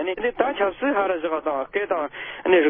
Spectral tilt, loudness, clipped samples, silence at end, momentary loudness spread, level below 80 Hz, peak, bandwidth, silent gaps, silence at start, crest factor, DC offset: -9 dB/octave; -24 LUFS; under 0.1%; 0 s; 4 LU; -58 dBFS; -6 dBFS; 3.7 kHz; none; 0 s; 16 dB; under 0.1%